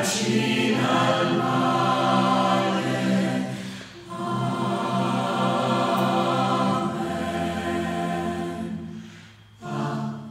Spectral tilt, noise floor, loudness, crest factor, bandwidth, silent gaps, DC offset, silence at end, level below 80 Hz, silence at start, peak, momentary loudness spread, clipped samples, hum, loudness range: -5 dB/octave; -47 dBFS; -24 LUFS; 16 dB; 16 kHz; none; under 0.1%; 0 s; -58 dBFS; 0 s; -8 dBFS; 12 LU; under 0.1%; none; 6 LU